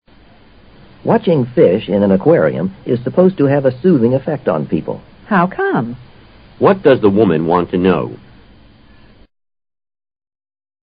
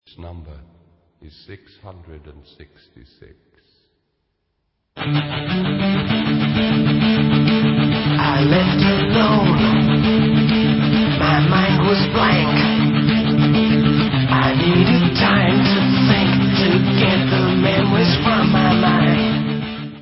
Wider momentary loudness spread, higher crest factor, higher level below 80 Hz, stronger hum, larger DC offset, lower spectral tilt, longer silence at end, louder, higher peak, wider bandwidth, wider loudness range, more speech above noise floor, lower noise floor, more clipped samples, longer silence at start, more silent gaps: first, 10 LU vs 5 LU; about the same, 16 dB vs 16 dB; second, -46 dBFS vs -38 dBFS; neither; neither; first, -12 dB/octave vs -10.5 dB/octave; first, 2.7 s vs 0 s; about the same, -14 LUFS vs -15 LUFS; about the same, 0 dBFS vs 0 dBFS; second, 5.2 kHz vs 5.8 kHz; second, 4 LU vs 7 LU; second, 32 dB vs 52 dB; second, -45 dBFS vs -71 dBFS; neither; first, 1.05 s vs 0.2 s; neither